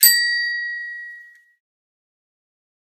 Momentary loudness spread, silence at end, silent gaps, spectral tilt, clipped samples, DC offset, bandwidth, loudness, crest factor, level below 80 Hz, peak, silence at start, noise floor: 21 LU; 1.7 s; none; 7 dB/octave; under 0.1%; under 0.1%; 19 kHz; -19 LUFS; 24 dB; -84 dBFS; 0 dBFS; 0 s; -44 dBFS